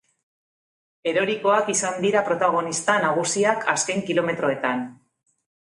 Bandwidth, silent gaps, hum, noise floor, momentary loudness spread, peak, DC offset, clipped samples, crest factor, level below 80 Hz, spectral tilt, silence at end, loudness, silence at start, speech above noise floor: 11.5 kHz; none; none; under -90 dBFS; 5 LU; -2 dBFS; under 0.1%; under 0.1%; 20 dB; -70 dBFS; -3 dB/octave; 0.7 s; -22 LUFS; 1.05 s; over 68 dB